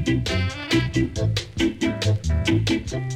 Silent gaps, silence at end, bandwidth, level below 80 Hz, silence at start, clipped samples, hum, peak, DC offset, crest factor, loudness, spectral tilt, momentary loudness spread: none; 0 s; 13.5 kHz; -34 dBFS; 0 s; under 0.1%; none; -6 dBFS; under 0.1%; 16 dB; -23 LUFS; -5.5 dB/octave; 4 LU